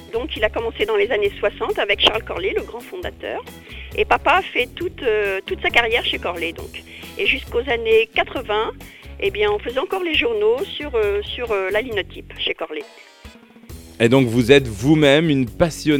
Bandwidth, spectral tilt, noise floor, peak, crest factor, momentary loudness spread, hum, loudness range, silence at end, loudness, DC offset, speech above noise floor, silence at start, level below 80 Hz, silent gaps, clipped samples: 17.5 kHz; -5 dB/octave; -43 dBFS; 0 dBFS; 20 dB; 15 LU; none; 4 LU; 0 s; -19 LUFS; under 0.1%; 24 dB; 0 s; -40 dBFS; none; under 0.1%